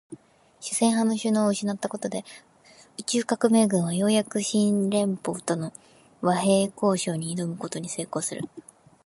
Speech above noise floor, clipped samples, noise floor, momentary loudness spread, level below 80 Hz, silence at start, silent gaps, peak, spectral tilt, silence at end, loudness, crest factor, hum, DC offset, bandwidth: 27 dB; under 0.1%; -52 dBFS; 12 LU; -70 dBFS; 0.1 s; none; -8 dBFS; -5 dB/octave; 0.45 s; -25 LUFS; 18 dB; none; under 0.1%; 11.5 kHz